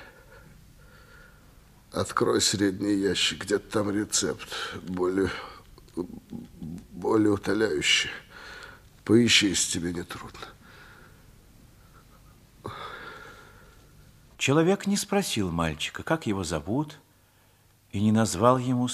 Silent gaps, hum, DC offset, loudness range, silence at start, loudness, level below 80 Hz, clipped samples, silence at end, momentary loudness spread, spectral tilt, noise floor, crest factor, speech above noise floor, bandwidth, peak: none; none; under 0.1%; 16 LU; 0 s; -25 LUFS; -54 dBFS; under 0.1%; 0 s; 20 LU; -4 dB/octave; -60 dBFS; 24 dB; 35 dB; 15.5 kHz; -4 dBFS